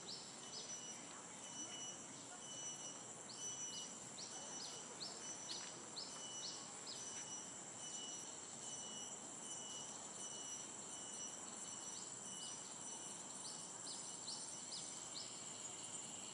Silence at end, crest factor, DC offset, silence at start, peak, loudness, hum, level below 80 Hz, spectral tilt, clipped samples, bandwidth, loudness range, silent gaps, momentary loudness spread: 0 s; 16 dB; under 0.1%; 0 s; -34 dBFS; -48 LUFS; none; -90 dBFS; -0.5 dB/octave; under 0.1%; 12 kHz; 1 LU; none; 3 LU